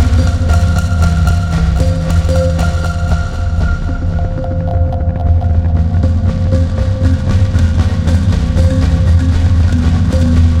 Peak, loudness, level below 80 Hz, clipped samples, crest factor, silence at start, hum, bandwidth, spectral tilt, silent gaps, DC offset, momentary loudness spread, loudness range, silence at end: 0 dBFS; -13 LUFS; -16 dBFS; under 0.1%; 10 dB; 0 s; none; 9.6 kHz; -7.5 dB/octave; none; under 0.1%; 5 LU; 3 LU; 0 s